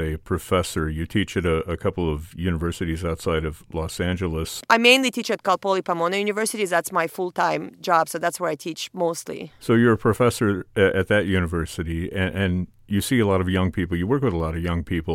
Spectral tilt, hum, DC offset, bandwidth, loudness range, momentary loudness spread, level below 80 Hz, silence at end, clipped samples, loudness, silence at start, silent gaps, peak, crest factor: -5 dB/octave; none; under 0.1%; 16.5 kHz; 4 LU; 9 LU; -40 dBFS; 0 s; under 0.1%; -23 LUFS; 0 s; none; 0 dBFS; 22 dB